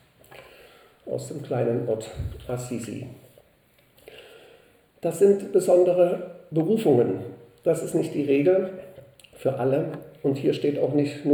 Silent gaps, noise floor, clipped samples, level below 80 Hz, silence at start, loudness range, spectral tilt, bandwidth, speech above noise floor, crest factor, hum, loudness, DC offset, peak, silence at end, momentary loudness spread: none; -61 dBFS; under 0.1%; -54 dBFS; 0.3 s; 9 LU; -7 dB/octave; 20 kHz; 37 dB; 18 dB; none; -24 LUFS; under 0.1%; -8 dBFS; 0 s; 14 LU